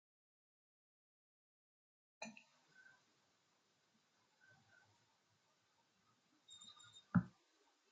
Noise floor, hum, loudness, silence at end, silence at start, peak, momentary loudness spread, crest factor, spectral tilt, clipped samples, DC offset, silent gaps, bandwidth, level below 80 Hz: -80 dBFS; none; -44 LUFS; 0.65 s; 2.2 s; -24 dBFS; 26 LU; 30 dB; -6 dB/octave; under 0.1%; under 0.1%; none; 8.8 kHz; -80 dBFS